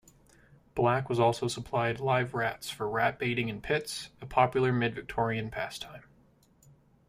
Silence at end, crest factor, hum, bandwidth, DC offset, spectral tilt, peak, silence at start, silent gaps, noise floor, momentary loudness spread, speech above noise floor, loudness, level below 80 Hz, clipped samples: 1.1 s; 22 dB; none; 15.5 kHz; under 0.1%; -5.5 dB/octave; -8 dBFS; 0.75 s; none; -63 dBFS; 10 LU; 33 dB; -30 LUFS; -58 dBFS; under 0.1%